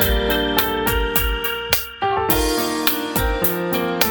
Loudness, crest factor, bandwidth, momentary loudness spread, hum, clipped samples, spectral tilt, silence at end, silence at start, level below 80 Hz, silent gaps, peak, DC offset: -19 LUFS; 20 dB; over 20 kHz; 4 LU; none; under 0.1%; -3.5 dB/octave; 0 s; 0 s; -28 dBFS; none; 0 dBFS; under 0.1%